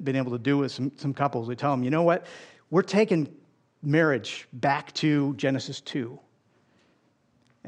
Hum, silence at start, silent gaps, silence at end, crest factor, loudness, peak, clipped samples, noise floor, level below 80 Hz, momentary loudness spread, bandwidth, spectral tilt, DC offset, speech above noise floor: none; 0 s; none; 0 s; 18 dB; -26 LUFS; -8 dBFS; under 0.1%; -66 dBFS; -76 dBFS; 11 LU; 9.6 kHz; -6.5 dB/octave; under 0.1%; 41 dB